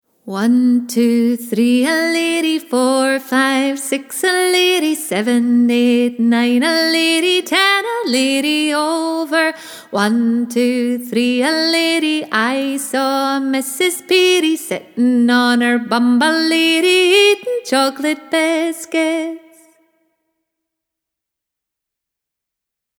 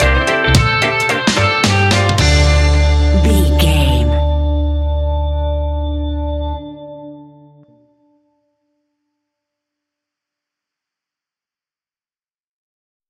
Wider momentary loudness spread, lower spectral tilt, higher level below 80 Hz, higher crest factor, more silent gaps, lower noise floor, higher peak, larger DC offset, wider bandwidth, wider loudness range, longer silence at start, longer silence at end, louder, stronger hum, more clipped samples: second, 6 LU vs 11 LU; second, -3 dB/octave vs -5 dB/octave; second, -72 dBFS vs -18 dBFS; about the same, 14 dB vs 16 dB; neither; second, -82 dBFS vs under -90 dBFS; about the same, -2 dBFS vs 0 dBFS; neither; first, 18.5 kHz vs 13.5 kHz; second, 4 LU vs 14 LU; first, 0.25 s vs 0 s; second, 3.6 s vs 5.85 s; about the same, -15 LUFS vs -14 LUFS; neither; neither